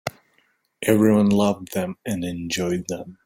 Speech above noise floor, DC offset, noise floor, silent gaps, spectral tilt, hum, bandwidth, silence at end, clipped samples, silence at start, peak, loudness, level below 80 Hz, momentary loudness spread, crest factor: 44 dB; under 0.1%; -65 dBFS; none; -5.5 dB/octave; none; 16.5 kHz; 0.1 s; under 0.1%; 0.05 s; -4 dBFS; -22 LUFS; -56 dBFS; 11 LU; 18 dB